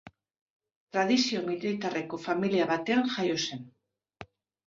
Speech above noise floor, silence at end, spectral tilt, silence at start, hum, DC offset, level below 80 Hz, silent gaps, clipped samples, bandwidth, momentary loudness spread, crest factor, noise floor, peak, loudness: 23 dB; 0.45 s; -4.5 dB/octave; 0.05 s; none; under 0.1%; -72 dBFS; 0.41-0.60 s, 0.76-0.87 s; under 0.1%; 7.6 kHz; 9 LU; 16 dB; -51 dBFS; -14 dBFS; -29 LUFS